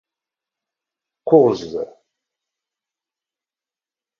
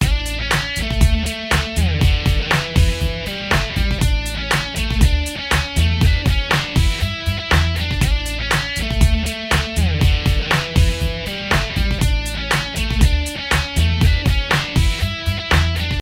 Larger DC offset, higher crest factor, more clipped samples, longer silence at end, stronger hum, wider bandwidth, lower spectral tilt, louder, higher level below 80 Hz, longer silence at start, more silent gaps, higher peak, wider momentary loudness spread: neither; first, 22 dB vs 16 dB; neither; first, 2.35 s vs 0 s; neither; second, 7 kHz vs 16.5 kHz; first, -8 dB/octave vs -4.5 dB/octave; about the same, -16 LUFS vs -18 LUFS; second, -64 dBFS vs -20 dBFS; first, 1.25 s vs 0 s; neither; about the same, 0 dBFS vs 0 dBFS; first, 18 LU vs 5 LU